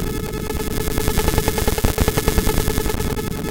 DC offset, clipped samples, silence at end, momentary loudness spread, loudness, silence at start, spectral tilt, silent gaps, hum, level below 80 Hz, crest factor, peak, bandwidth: under 0.1%; under 0.1%; 0 s; 6 LU; -21 LUFS; 0 s; -4.5 dB/octave; none; none; -24 dBFS; 18 dB; 0 dBFS; 17.5 kHz